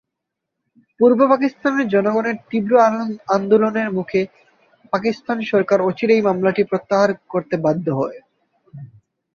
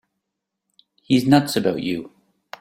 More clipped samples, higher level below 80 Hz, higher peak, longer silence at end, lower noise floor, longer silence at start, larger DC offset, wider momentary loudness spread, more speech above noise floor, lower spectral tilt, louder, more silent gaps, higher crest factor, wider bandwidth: neither; about the same, -62 dBFS vs -58 dBFS; about the same, -2 dBFS vs -2 dBFS; about the same, 0.5 s vs 0.55 s; about the same, -80 dBFS vs -81 dBFS; about the same, 1 s vs 1.1 s; neither; second, 8 LU vs 11 LU; about the same, 63 dB vs 62 dB; about the same, -7 dB/octave vs -6 dB/octave; about the same, -18 LUFS vs -20 LUFS; neither; about the same, 16 dB vs 20 dB; second, 7 kHz vs 16 kHz